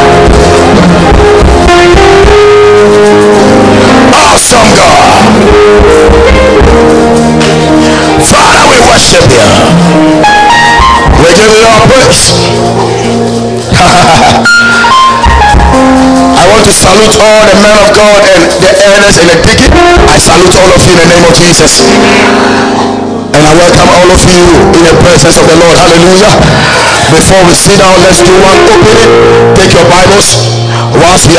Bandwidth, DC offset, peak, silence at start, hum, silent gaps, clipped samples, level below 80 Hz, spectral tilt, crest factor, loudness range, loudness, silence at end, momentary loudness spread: 11 kHz; 3%; 0 dBFS; 0 s; none; none; 50%; -14 dBFS; -4 dB/octave; 2 dB; 2 LU; -2 LUFS; 0 s; 3 LU